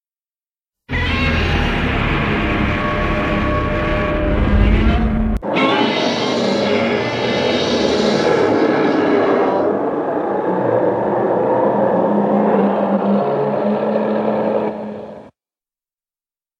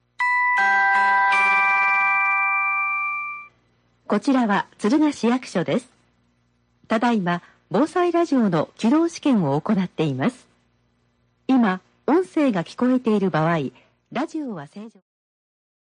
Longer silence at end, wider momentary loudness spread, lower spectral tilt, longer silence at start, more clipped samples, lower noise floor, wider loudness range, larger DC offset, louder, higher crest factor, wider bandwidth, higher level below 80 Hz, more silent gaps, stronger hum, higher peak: first, 1.3 s vs 1.1 s; second, 4 LU vs 11 LU; about the same, -6.5 dB/octave vs -6 dB/octave; first, 0.9 s vs 0.2 s; neither; first, under -90 dBFS vs -65 dBFS; about the same, 3 LU vs 5 LU; neither; first, -17 LUFS vs -20 LUFS; about the same, 14 dB vs 14 dB; about the same, 9.6 kHz vs 10 kHz; first, -26 dBFS vs -68 dBFS; neither; second, none vs 60 Hz at -50 dBFS; first, -2 dBFS vs -8 dBFS